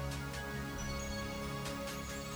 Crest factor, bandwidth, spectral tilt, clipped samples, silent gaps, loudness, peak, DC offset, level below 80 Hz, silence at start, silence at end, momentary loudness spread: 14 dB; over 20 kHz; -4.5 dB/octave; under 0.1%; none; -41 LUFS; -26 dBFS; under 0.1%; -48 dBFS; 0 s; 0 s; 1 LU